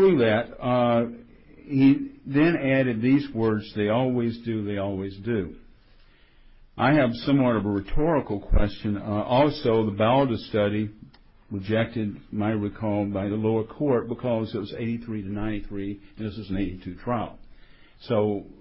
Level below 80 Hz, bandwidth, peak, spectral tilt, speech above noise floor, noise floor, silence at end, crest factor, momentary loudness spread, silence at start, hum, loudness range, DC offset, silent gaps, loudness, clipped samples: -40 dBFS; 5.8 kHz; -8 dBFS; -11.5 dB/octave; 30 dB; -54 dBFS; 0.1 s; 16 dB; 11 LU; 0 s; none; 7 LU; under 0.1%; none; -25 LUFS; under 0.1%